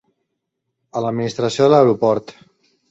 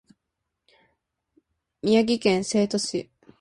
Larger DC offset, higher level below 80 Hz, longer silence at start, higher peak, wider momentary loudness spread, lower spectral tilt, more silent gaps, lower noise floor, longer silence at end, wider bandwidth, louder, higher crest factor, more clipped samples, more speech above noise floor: neither; about the same, -60 dBFS vs -64 dBFS; second, 0.95 s vs 1.85 s; first, -2 dBFS vs -8 dBFS; about the same, 11 LU vs 10 LU; first, -6.5 dB/octave vs -4.5 dB/octave; neither; second, -76 dBFS vs -82 dBFS; first, 0.6 s vs 0.4 s; second, 8 kHz vs 11.5 kHz; first, -17 LUFS vs -23 LUFS; about the same, 18 dB vs 18 dB; neither; about the same, 60 dB vs 59 dB